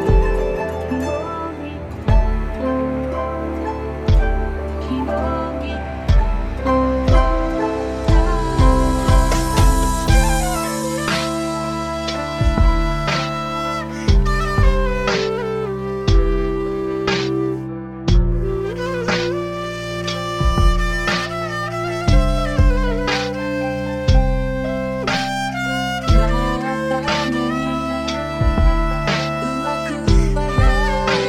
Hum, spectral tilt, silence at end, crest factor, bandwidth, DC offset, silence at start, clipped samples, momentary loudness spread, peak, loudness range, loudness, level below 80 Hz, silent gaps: none; -5.5 dB/octave; 0 s; 16 dB; 14 kHz; under 0.1%; 0 s; under 0.1%; 7 LU; 0 dBFS; 4 LU; -20 LUFS; -20 dBFS; none